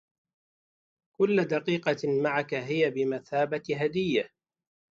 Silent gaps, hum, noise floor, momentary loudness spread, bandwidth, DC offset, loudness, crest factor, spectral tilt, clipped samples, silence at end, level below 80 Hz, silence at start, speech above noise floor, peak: none; none; under -90 dBFS; 4 LU; 7.6 kHz; under 0.1%; -28 LUFS; 18 dB; -6.5 dB/octave; under 0.1%; 0.7 s; -70 dBFS; 1.2 s; over 63 dB; -12 dBFS